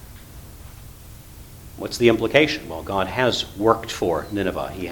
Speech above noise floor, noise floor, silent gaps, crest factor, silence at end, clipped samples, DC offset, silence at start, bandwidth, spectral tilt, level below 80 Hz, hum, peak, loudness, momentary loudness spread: 20 dB; -41 dBFS; none; 24 dB; 0 s; under 0.1%; under 0.1%; 0 s; 19 kHz; -5 dB/octave; -44 dBFS; none; 0 dBFS; -21 LUFS; 24 LU